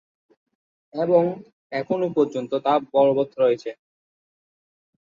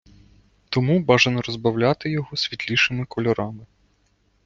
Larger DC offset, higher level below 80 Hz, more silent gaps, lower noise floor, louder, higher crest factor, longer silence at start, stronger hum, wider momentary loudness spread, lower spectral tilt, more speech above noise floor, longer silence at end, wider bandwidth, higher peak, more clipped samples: neither; second, -70 dBFS vs -54 dBFS; first, 1.53-1.70 s vs none; first, under -90 dBFS vs -64 dBFS; about the same, -22 LUFS vs -21 LUFS; about the same, 18 dB vs 20 dB; first, 0.95 s vs 0.7 s; neither; first, 12 LU vs 9 LU; first, -7.5 dB/octave vs -5.5 dB/octave; first, over 69 dB vs 43 dB; first, 1.4 s vs 0.8 s; about the same, 7.2 kHz vs 7.6 kHz; second, -6 dBFS vs -2 dBFS; neither